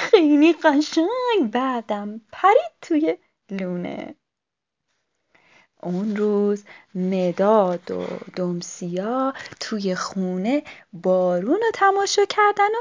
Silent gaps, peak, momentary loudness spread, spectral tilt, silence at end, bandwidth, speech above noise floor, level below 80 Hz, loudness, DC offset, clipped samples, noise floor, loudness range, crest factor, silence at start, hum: none; -2 dBFS; 13 LU; -5.5 dB/octave; 0 s; 7.6 kHz; 64 dB; -70 dBFS; -21 LUFS; under 0.1%; under 0.1%; -85 dBFS; 7 LU; 20 dB; 0 s; none